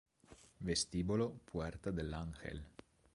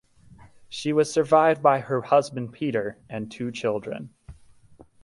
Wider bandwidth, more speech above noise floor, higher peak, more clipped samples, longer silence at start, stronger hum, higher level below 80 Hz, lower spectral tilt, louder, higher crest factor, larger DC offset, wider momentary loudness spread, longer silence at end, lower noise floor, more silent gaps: about the same, 11.5 kHz vs 11.5 kHz; second, 24 dB vs 29 dB; second, -24 dBFS vs -4 dBFS; neither; second, 0.3 s vs 0.7 s; neither; first, -54 dBFS vs -60 dBFS; about the same, -4.5 dB/octave vs -5.5 dB/octave; second, -41 LUFS vs -24 LUFS; about the same, 18 dB vs 20 dB; neither; second, 12 LU vs 17 LU; second, 0.45 s vs 0.7 s; first, -64 dBFS vs -52 dBFS; neither